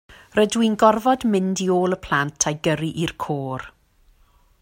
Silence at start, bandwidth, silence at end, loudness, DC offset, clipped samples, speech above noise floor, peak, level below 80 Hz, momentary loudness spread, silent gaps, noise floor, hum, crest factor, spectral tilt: 0.1 s; 16.5 kHz; 0.95 s; -21 LUFS; under 0.1%; under 0.1%; 36 dB; -2 dBFS; -52 dBFS; 10 LU; none; -57 dBFS; none; 20 dB; -4.5 dB/octave